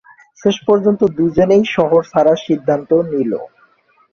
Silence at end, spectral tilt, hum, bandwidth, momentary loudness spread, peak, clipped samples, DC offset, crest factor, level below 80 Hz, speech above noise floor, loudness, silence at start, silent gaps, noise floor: 0.65 s; -7 dB/octave; none; 7 kHz; 7 LU; -2 dBFS; under 0.1%; under 0.1%; 14 dB; -48 dBFS; 40 dB; -15 LUFS; 0.45 s; none; -54 dBFS